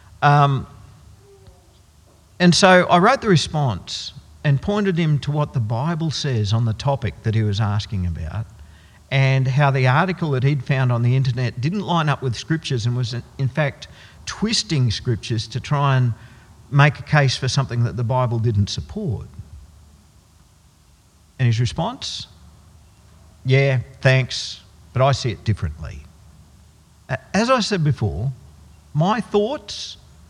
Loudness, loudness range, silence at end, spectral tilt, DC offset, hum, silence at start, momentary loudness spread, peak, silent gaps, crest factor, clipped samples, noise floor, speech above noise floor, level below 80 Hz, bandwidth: -20 LUFS; 7 LU; 0.35 s; -5.5 dB/octave; under 0.1%; none; 0.2 s; 14 LU; 0 dBFS; none; 20 dB; under 0.1%; -53 dBFS; 34 dB; -46 dBFS; 10.5 kHz